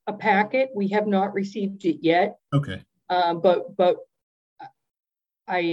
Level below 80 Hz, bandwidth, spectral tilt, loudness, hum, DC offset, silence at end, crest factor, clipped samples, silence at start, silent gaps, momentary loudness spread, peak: -68 dBFS; 8.2 kHz; -7.5 dB/octave; -23 LUFS; none; under 0.1%; 0 s; 18 dB; under 0.1%; 0.05 s; 4.23-4.56 s; 8 LU; -6 dBFS